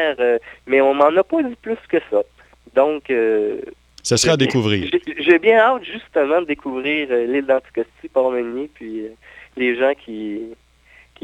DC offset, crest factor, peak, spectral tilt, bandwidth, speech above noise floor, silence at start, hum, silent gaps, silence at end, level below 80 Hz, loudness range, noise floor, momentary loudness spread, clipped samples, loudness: under 0.1%; 18 dB; -2 dBFS; -4.5 dB/octave; 14 kHz; 33 dB; 0 s; none; none; 0.7 s; -54 dBFS; 5 LU; -51 dBFS; 15 LU; under 0.1%; -18 LUFS